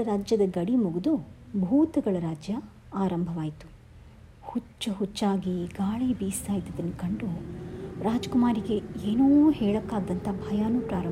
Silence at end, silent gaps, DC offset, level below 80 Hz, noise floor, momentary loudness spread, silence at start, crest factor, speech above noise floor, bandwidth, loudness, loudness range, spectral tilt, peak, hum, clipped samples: 0 s; none; under 0.1%; -50 dBFS; -49 dBFS; 12 LU; 0 s; 16 dB; 23 dB; 16 kHz; -28 LUFS; 6 LU; -7 dB/octave; -12 dBFS; none; under 0.1%